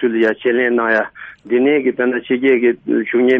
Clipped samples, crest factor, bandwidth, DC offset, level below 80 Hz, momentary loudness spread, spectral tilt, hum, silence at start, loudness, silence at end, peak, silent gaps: under 0.1%; 12 dB; 5 kHz; under 0.1%; -62 dBFS; 5 LU; -7 dB/octave; none; 0 s; -16 LUFS; 0 s; -2 dBFS; none